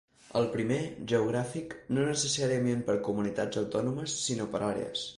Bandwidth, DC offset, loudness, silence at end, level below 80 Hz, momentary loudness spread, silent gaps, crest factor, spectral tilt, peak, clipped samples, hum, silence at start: 11.5 kHz; under 0.1%; -31 LUFS; 0 s; -62 dBFS; 5 LU; none; 16 dB; -4.5 dB/octave; -16 dBFS; under 0.1%; none; 0.3 s